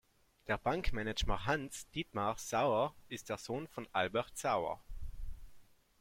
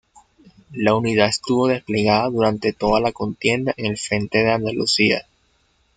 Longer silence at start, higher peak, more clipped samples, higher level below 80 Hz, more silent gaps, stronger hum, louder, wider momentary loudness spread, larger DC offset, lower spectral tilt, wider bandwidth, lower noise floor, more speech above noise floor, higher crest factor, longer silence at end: second, 0.45 s vs 0.7 s; second, -18 dBFS vs -2 dBFS; neither; about the same, -48 dBFS vs -50 dBFS; neither; neither; second, -37 LUFS vs -19 LUFS; first, 16 LU vs 6 LU; neither; about the same, -4.5 dB/octave vs -4.5 dB/octave; first, 16.5 kHz vs 9.4 kHz; about the same, -59 dBFS vs -62 dBFS; second, 22 dB vs 43 dB; about the same, 20 dB vs 20 dB; second, 0.4 s vs 0.75 s